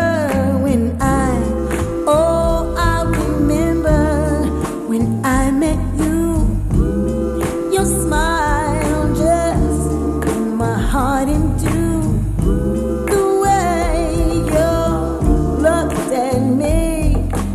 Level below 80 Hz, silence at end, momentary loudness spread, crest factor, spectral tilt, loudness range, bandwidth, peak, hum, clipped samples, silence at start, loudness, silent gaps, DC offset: -22 dBFS; 0 s; 4 LU; 14 dB; -6.5 dB/octave; 1 LU; 14.5 kHz; -2 dBFS; none; under 0.1%; 0 s; -17 LUFS; none; under 0.1%